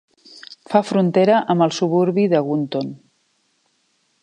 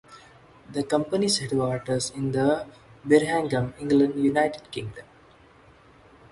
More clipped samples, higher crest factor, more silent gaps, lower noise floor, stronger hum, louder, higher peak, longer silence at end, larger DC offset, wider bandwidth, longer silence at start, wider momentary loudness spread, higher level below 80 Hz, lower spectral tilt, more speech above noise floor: neither; about the same, 18 dB vs 20 dB; neither; first, -65 dBFS vs -54 dBFS; neither; first, -18 LUFS vs -25 LUFS; first, -2 dBFS vs -6 dBFS; about the same, 1.25 s vs 1.3 s; neither; second, 9.8 kHz vs 11.5 kHz; first, 0.35 s vs 0.1 s; about the same, 13 LU vs 15 LU; second, -72 dBFS vs -58 dBFS; first, -6.5 dB/octave vs -5 dB/octave; first, 48 dB vs 30 dB